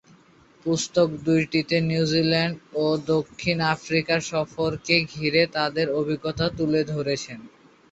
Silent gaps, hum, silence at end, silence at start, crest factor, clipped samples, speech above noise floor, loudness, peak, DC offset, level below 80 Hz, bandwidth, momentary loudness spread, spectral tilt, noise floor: none; none; 0.45 s; 0.65 s; 18 dB; under 0.1%; 31 dB; -24 LUFS; -6 dBFS; under 0.1%; -56 dBFS; 8.2 kHz; 6 LU; -5 dB/octave; -55 dBFS